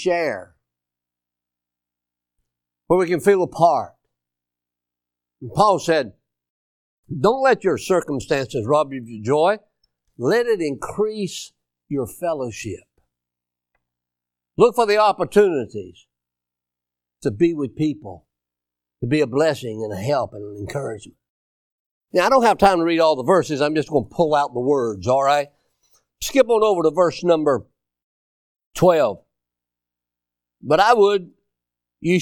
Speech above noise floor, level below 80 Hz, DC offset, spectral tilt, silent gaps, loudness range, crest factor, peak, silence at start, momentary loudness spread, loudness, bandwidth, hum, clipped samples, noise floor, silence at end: 68 dB; -54 dBFS; under 0.1%; -5.5 dB/octave; 6.50-7.03 s, 21.30-22.01 s, 28.04-28.55 s, 28.66-28.71 s; 6 LU; 20 dB; 0 dBFS; 0 s; 16 LU; -19 LUFS; 17.5 kHz; 60 Hz at -55 dBFS; under 0.1%; -87 dBFS; 0 s